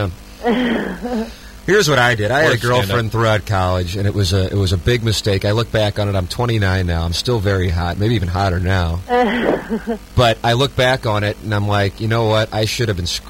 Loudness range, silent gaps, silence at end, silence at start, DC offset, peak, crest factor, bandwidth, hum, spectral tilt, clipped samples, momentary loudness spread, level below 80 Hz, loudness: 2 LU; none; 0 s; 0 s; under 0.1%; -2 dBFS; 16 dB; 16.5 kHz; none; -5.5 dB/octave; under 0.1%; 6 LU; -34 dBFS; -17 LUFS